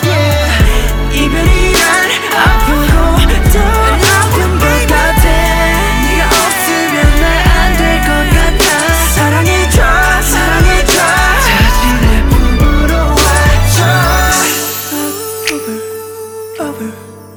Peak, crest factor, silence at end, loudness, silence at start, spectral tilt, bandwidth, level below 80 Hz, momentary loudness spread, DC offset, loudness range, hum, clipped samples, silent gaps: 0 dBFS; 10 dB; 0 s; -10 LUFS; 0 s; -4 dB/octave; over 20 kHz; -14 dBFS; 8 LU; under 0.1%; 2 LU; none; under 0.1%; none